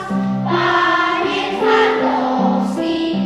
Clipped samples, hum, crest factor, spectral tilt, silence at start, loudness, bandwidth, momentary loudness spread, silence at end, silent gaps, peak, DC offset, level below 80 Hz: under 0.1%; none; 14 dB; -6 dB/octave; 0 s; -16 LUFS; 11.5 kHz; 5 LU; 0 s; none; -2 dBFS; under 0.1%; -52 dBFS